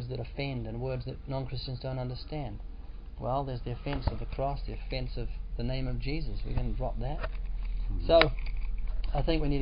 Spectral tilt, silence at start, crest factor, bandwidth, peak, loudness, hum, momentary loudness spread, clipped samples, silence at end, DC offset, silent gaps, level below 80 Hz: -10 dB/octave; 0 s; 26 dB; 5.2 kHz; -4 dBFS; -34 LUFS; none; 10 LU; under 0.1%; 0 s; under 0.1%; none; -36 dBFS